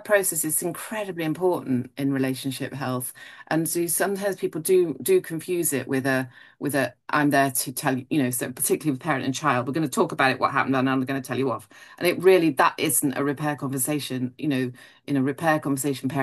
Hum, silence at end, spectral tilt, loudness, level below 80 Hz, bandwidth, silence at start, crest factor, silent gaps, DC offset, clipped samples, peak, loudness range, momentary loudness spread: none; 0 s; -4.5 dB/octave; -24 LUFS; -70 dBFS; 13 kHz; 0 s; 20 dB; none; under 0.1%; under 0.1%; -4 dBFS; 4 LU; 8 LU